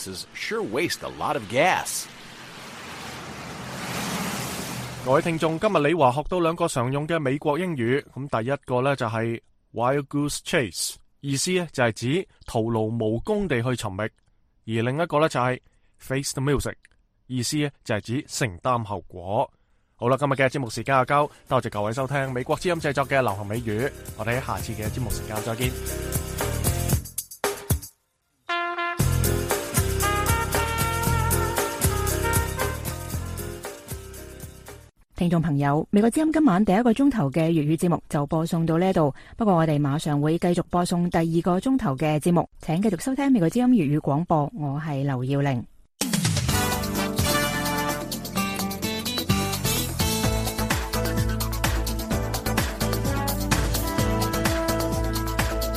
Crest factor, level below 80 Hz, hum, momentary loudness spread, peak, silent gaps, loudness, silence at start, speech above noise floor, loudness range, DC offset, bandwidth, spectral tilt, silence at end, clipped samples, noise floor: 20 dB; -38 dBFS; none; 10 LU; -6 dBFS; none; -25 LUFS; 0 s; 47 dB; 5 LU; under 0.1%; 15.5 kHz; -5 dB/octave; 0 s; under 0.1%; -71 dBFS